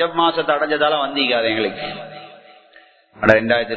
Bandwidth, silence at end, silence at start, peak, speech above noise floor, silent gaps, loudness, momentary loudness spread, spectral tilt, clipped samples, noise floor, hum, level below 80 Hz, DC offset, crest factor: 8 kHz; 0 s; 0 s; 0 dBFS; 32 dB; none; -18 LUFS; 15 LU; -6 dB/octave; under 0.1%; -50 dBFS; none; -54 dBFS; under 0.1%; 20 dB